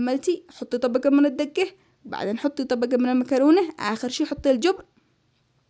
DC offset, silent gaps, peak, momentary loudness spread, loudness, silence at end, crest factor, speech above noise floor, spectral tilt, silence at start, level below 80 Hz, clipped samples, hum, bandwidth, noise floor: under 0.1%; none; -8 dBFS; 11 LU; -23 LUFS; 0.9 s; 16 dB; 44 dB; -4.5 dB/octave; 0 s; -58 dBFS; under 0.1%; none; 8 kHz; -66 dBFS